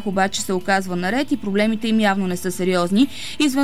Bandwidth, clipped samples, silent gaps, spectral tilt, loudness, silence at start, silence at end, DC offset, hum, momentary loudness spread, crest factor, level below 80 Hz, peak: 16 kHz; under 0.1%; none; -4.5 dB/octave; -20 LUFS; 0 s; 0 s; 2%; none; 4 LU; 14 dB; -52 dBFS; -6 dBFS